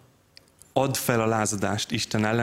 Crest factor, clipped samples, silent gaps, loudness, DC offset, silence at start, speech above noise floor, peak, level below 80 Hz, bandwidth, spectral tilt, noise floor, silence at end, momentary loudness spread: 22 dB; under 0.1%; none; -25 LUFS; under 0.1%; 0.75 s; 32 dB; -6 dBFS; -58 dBFS; 16 kHz; -4.5 dB/octave; -56 dBFS; 0 s; 4 LU